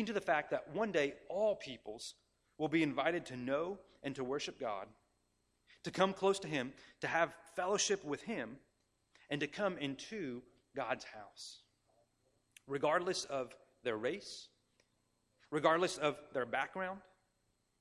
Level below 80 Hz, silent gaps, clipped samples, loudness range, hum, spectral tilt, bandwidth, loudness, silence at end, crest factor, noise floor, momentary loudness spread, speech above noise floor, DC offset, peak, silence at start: -76 dBFS; none; under 0.1%; 6 LU; none; -4 dB/octave; 14 kHz; -38 LUFS; 0.8 s; 24 dB; -80 dBFS; 15 LU; 42 dB; under 0.1%; -16 dBFS; 0 s